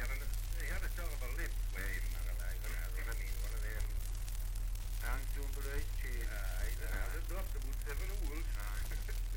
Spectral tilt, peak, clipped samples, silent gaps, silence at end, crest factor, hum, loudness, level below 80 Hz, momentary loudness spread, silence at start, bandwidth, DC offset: -4 dB/octave; -22 dBFS; under 0.1%; none; 0 s; 14 dB; none; -42 LUFS; -38 dBFS; 2 LU; 0 s; 17 kHz; under 0.1%